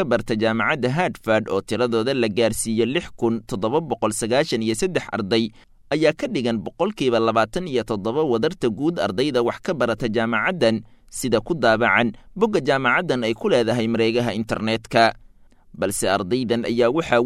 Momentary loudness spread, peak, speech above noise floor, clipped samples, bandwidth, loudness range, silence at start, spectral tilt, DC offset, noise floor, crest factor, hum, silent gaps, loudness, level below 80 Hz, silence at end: 6 LU; -2 dBFS; 28 dB; under 0.1%; 14.5 kHz; 2 LU; 0 s; -5 dB/octave; under 0.1%; -49 dBFS; 18 dB; none; none; -21 LUFS; -48 dBFS; 0 s